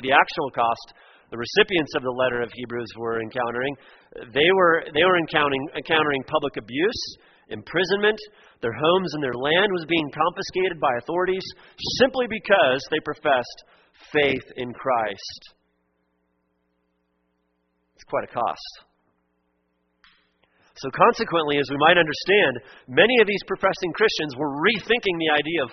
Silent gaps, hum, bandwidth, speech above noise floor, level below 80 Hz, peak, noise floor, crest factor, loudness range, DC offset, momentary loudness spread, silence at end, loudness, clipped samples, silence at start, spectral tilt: none; none; 6.4 kHz; 49 dB; -58 dBFS; 0 dBFS; -71 dBFS; 24 dB; 14 LU; under 0.1%; 13 LU; 0 s; -22 LUFS; under 0.1%; 0 s; -2 dB/octave